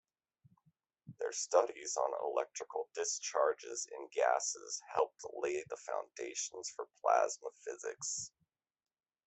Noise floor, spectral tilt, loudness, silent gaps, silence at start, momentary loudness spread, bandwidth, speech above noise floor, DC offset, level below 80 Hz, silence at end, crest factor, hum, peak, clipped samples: -76 dBFS; -1 dB/octave; -37 LUFS; none; 1.05 s; 11 LU; 8.4 kHz; 39 dB; under 0.1%; -86 dBFS; 1 s; 24 dB; none; -14 dBFS; under 0.1%